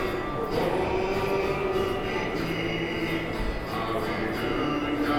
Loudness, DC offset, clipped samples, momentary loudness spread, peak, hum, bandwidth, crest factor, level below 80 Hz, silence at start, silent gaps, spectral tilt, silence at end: -28 LUFS; under 0.1%; under 0.1%; 3 LU; -14 dBFS; none; 18.5 kHz; 14 dB; -40 dBFS; 0 s; none; -6 dB/octave; 0 s